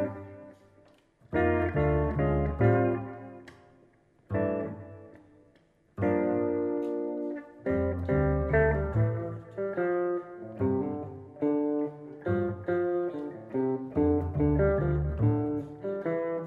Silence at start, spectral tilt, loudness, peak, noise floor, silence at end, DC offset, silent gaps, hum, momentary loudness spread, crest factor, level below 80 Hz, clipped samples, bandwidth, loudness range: 0 s; -11 dB/octave; -29 LUFS; -10 dBFS; -64 dBFS; 0 s; under 0.1%; none; none; 13 LU; 18 dB; -42 dBFS; under 0.1%; 4.2 kHz; 4 LU